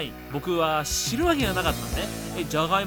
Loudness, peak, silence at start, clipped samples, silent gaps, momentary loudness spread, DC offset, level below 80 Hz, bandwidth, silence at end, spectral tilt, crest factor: -26 LUFS; -8 dBFS; 0 s; under 0.1%; none; 8 LU; under 0.1%; -38 dBFS; over 20 kHz; 0 s; -4 dB/octave; 18 dB